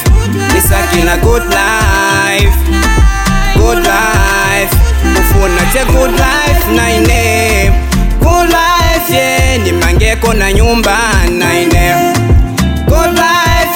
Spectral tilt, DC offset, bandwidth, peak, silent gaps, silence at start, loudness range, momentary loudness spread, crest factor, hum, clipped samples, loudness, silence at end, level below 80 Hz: -4.5 dB/octave; 0.3%; 19 kHz; 0 dBFS; none; 0 s; 0 LU; 2 LU; 8 dB; none; under 0.1%; -9 LUFS; 0 s; -12 dBFS